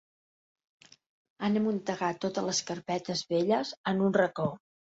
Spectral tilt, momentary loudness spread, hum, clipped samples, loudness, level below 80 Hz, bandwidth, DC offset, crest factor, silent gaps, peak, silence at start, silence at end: -4.5 dB/octave; 7 LU; none; under 0.1%; -30 LUFS; -72 dBFS; 8 kHz; under 0.1%; 20 dB; 3.77-3.84 s; -12 dBFS; 1.4 s; 0.3 s